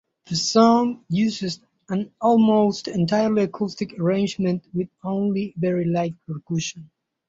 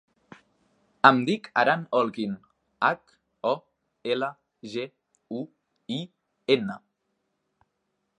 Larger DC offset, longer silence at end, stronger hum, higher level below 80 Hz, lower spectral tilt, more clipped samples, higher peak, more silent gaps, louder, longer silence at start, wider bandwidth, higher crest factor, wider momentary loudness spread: neither; second, 0.45 s vs 1.4 s; neither; first, -60 dBFS vs -74 dBFS; about the same, -6 dB/octave vs -6 dB/octave; neither; about the same, -4 dBFS vs -2 dBFS; neither; first, -22 LUFS vs -26 LUFS; second, 0.3 s vs 1.05 s; second, 7.8 kHz vs 10.5 kHz; second, 18 dB vs 28 dB; second, 12 LU vs 20 LU